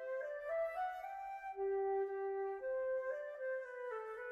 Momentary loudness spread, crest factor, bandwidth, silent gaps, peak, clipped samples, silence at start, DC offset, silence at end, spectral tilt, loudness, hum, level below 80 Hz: 7 LU; 10 dB; 12 kHz; none; -30 dBFS; under 0.1%; 0 s; under 0.1%; 0 s; -5 dB/octave; -42 LUFS; none; -78 dBFS